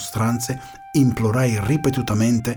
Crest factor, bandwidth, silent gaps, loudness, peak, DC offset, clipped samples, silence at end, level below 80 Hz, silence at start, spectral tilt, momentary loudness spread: 14 dB; over 20 kHz; none; -20 LUFS; -6 dBFS; under 0.1%; under 0.1%; 0 s; -44 dBFS; 0 s; -6 dB/octave; 6 LU